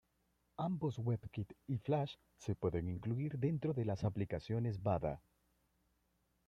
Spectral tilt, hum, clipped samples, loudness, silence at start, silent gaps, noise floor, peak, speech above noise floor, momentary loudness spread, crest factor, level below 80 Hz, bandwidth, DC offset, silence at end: -8.5 dB/octave; none; under 0.1%; -40 LUFS; 0.6 s; none; -80 dBFS; -22 dBFS; 41 dB; 8 LU; 18 dB; -64 dBFS; 7.6 kHz; under 0.1%; 1.3 s